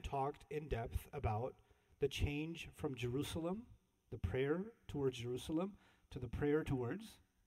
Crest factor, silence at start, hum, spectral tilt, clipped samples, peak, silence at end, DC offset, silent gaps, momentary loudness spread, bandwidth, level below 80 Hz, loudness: 18 dB; 0 s; none; -6.5 dB/octave; under 0.1%; -26 dBFS; 0.3 s; under 0.1%; none; 10 LU; 16 kHz; -54 dBFS; -43 LUFS